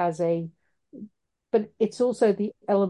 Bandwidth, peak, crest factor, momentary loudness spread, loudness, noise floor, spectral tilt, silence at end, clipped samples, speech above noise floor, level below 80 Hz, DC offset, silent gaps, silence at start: 11.5 kHz; -10 dBFS; 16 dB; 22 LU; -26 LUFS; -50 dBFS; -7 dB/octave; 0 s; under 0.1%; 26 dB; -72 dBFS; under 0.1%; none; 0 s